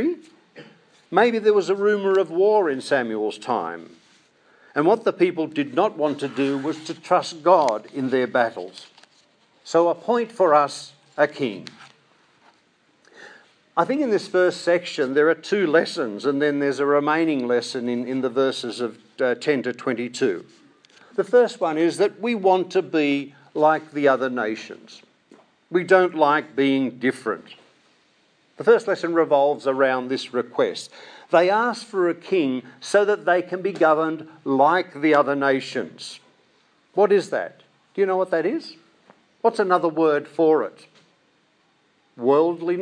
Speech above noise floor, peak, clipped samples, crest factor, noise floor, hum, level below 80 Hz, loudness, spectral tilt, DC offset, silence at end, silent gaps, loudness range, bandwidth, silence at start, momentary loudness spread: 42 dB; -2 dBFS; under 0.1%; 20 dB; -63 dBFS; none; -82 dBFS; -21 LUFS; -5 dB/octave; under 0.1%; 0 s; none; 3 LU; 10.5 kHz; 0 s; 11 LU